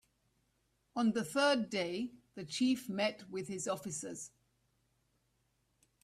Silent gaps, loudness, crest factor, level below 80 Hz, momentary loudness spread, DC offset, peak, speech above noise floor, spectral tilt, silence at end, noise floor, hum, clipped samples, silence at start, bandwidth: none; -36 LUFS; 18 dB; -78 dBFS; 14 LU; under 0.1%; -20 dBFS; 43 dB; -4 dB/octave; 1.75 s; -78 dBFS; none; under 0.1%; 0.95 s; 15 kHz